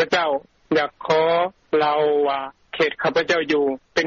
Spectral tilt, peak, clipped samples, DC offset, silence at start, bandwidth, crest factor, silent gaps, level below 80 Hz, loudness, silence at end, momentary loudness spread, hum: -2 dB/octave; -8 dBFS; under 0.1%; under 0.1%; 0 s; 7.2 kHz; 14 dB; none; -60 dBFS; -21 LUFS; 0 s; 5 LU; none